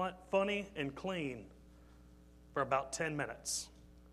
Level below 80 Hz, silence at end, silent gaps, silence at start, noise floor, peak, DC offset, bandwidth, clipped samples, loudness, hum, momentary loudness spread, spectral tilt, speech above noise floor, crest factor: -62 dBFS; 0 s; none; 0 s; -60 dBFS; -18 dBFS; under 0.1%; 14.5 kHz; under 0.1%; -38 LUFS; none; 10 LU; -3.5 dB/octave; 22 dB; 22 dB